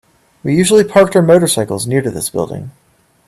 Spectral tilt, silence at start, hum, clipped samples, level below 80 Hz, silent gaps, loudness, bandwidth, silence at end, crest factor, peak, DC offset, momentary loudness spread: -5 dB/octave; 0.45 s; none; under 0.1%; -48 dBFS; none; -12 LUFS; 15 kHz; 0.55 s; 14 dB; 0 dBFS; under 0.1%; 13 LU